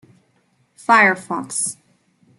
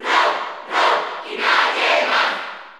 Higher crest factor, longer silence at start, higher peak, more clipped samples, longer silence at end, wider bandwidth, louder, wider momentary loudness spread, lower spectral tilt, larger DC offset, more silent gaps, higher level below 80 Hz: about the same, 20 dB vs 16 dB; first, 0.9 s vs 0 s; about the same, -2 dBFS vs -2 dBFS; neither; first, 0.65 s vs 0 s; second, 12.5 kHz vs 18 kHz; about the same, -17 LUFS vs -18 LUFS; first, 12 LU vs 9 LU; first, -2.5 dB/octave vs -0.5 dB/octave; neither; neither; about the same, -74 dBFS vs -78 dBFS